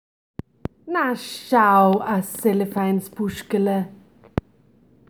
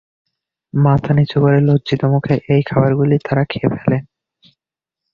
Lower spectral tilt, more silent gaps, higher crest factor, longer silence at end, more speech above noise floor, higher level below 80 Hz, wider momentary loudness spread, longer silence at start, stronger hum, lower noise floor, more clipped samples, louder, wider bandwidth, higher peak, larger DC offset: second, -6 dB/octave vs -9.5 dB/octave; neither; first, 20 dB vs 14 dB; about the same, 1.15 s vs 1.1 s; second, 36 dB vs 72 dB; about the same, -50 dBFS vs -46 dBFS; first, 20 LU vs 5 LU; about the same, 0.85 s vs 0.75 s; neither; second, -56 dBFS vs -86 dBFS; neither; second, -21 LUFS vs -15 LUFS; first, over 20 kHz vs 5 kHz; about the same, -2 dBFS vs -2 dBFS; neither